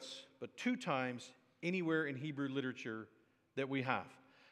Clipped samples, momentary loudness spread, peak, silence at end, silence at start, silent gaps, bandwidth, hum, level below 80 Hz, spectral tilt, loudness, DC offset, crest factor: under 0.1%; 14 LU; -18 dBFS; 0.3 s; 0 s; none; 11.5 kHz; none; under -90 dBFS; -5.5 dB/octave; -41 LUFS; under 0.1%; 24 dB